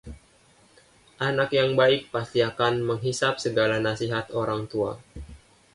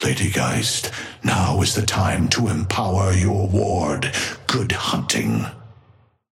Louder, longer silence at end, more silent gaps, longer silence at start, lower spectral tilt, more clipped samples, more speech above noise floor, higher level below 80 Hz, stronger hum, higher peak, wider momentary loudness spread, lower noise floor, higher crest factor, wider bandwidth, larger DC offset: second, -25 LUFS vs -20 LUFS; second, 0.4 s vs 0.6 s; neither; about the same, 0.05 s vs 0 s; about the same, -5 dB/octave vs -4.5 dB/octave; neither; about the same, 34 dB vs 35 dB; second, -52 dBFS vs -42 dBFS; neither; second, -8 dBFS vs -4 dBFS; first, 9 LU vs 5 LU; about the same, -58 dBFS vs -55 dBFS; about the same, 18 dB vs 18 dB; second, 11.5 kHz vs 16 kHz; neither